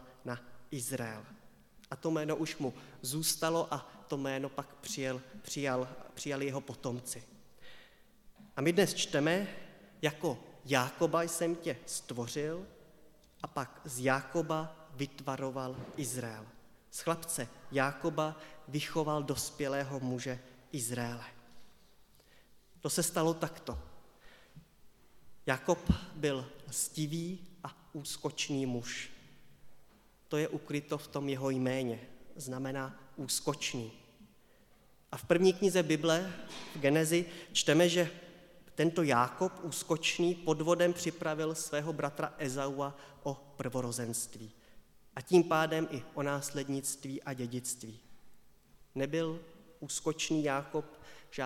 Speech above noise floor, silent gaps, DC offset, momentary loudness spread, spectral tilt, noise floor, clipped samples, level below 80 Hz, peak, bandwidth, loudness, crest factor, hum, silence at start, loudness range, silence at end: 31 dB; none; under 0.1%; 15 LU; -4 dB/octave; -65 dBFS; under 0.1%; -60 dBFS; -12 dBFS; 17 kHz; -35 LUFS; 24 dB; none; 0 s; 8 LU; 0 s